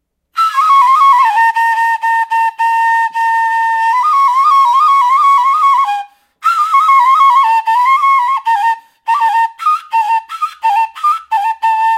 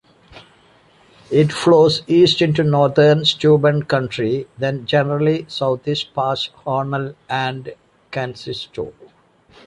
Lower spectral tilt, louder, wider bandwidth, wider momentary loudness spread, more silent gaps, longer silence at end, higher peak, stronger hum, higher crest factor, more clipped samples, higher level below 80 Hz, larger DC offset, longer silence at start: second, 4 dB/octave vs -6.5 dB/octave; first, -11 LUFS vs -17 LUFS; first, 15.5 kHz vs 11 kHz; second, 8 LU vs 14 LU; neither; second, 0 s vs 0.75 s; about the same, 0 dBFS vs -2 dBFS; neither; second, 10 dB vs 16 dB; neither; second, -74 dBFS vs -54 dBFS; neither; about the same, 0.35 s vs 0.35 s